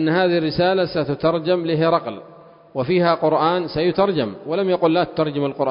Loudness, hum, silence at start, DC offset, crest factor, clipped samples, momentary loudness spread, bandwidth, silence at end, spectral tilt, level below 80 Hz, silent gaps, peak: -19 LUFS; none; 0 s; under 0.1%; 16 dB; under 0.1%; 6 LU; 5.4 kHz; 0 s; -11 dB/octave; -52 dBFS; none; -4 dBFS